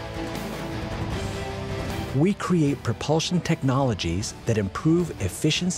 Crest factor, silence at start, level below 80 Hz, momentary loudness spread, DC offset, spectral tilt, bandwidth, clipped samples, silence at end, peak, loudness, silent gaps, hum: 16 dB; 0 s; -42 dBFS; 9 LU; under 0.1%; -5.5 dB/octave; 16 kHz; under 0.1%; 0 s; -8 dBFS; -25 LUFS; none; none